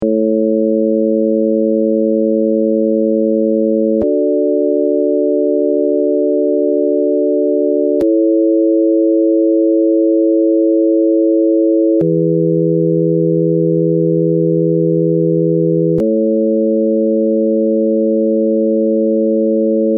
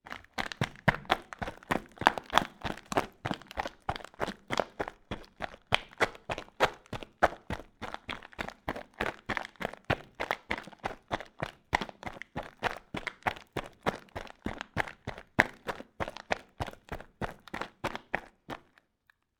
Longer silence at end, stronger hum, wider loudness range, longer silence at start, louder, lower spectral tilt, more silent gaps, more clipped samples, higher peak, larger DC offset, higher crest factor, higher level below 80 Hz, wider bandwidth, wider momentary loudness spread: second, 0 s vs 0.8 s; neither; second, 2 LU vs 5 LU; about the same, 0 s vs 0.05 s; first, -13 LUFS vs -35 LUFS; first, -12 dB/octave vs -4.5 dB/octave; neither; neither; about the same, -4 dBFS vs -2 dBFS; neither; second, 8 dB vs 32 dB; about the same, -58 dBFS vs -54 dBFS; second, 1 kHz vs over 20 kHz; second, 2 LU vs 13 LU